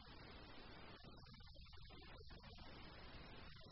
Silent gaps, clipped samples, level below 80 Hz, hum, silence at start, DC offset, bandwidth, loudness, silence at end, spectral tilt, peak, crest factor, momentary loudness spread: none; under 0.1%; -64 dBFS; none; 0 s; under 0.1%; 5.8 kHz; -60 LUFS; 0 s; -3.5 dB/octave; -46 dBFS; 12 dB; 3 LU